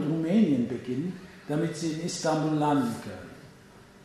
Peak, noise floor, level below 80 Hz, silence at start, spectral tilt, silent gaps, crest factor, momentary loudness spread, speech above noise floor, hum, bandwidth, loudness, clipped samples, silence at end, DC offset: -12 dBFS; -52 dBFS; -64 dBFS; 0 s; -6 dB/octave; none; 16 dB; 17 LU; 23 dB; none; 13.5 kHz; -28 LUFS; under 0.1%; 0.25 s; under 0.1%